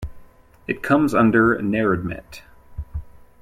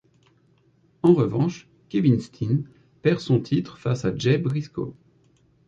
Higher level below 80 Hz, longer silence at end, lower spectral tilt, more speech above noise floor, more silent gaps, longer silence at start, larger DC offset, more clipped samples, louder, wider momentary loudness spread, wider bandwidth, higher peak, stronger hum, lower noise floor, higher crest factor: first, -40 dBFS vs -56 dBFS; second, 0.25 s vs 0.75 s; about the same, -7.5 dB/octave vs -8 dB/octave; second, 27 dB vs 39 dB; neither; second, 0 s vs 1.05 s; neither; neither; first, -19 LUFS vs -24 LUFS; first, 22 LU vs 12 LU; first, 15 kHz vs 7.8 kHz; about the same, -4 dBFS vs -4 dBFS; neither; second, -46 dBFS vs -61 dBFS; about the same, 18 dB vs 20 dB